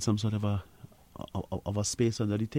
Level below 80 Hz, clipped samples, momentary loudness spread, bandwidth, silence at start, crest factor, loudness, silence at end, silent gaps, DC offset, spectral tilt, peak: -56 dBFS; under 0.1%; 12 LU; 15.5 kHz; 0 s; 16 dB; -32 LUFS; 0 s; none; under 0.1%; -5.5 dB/octave; -14 dBFS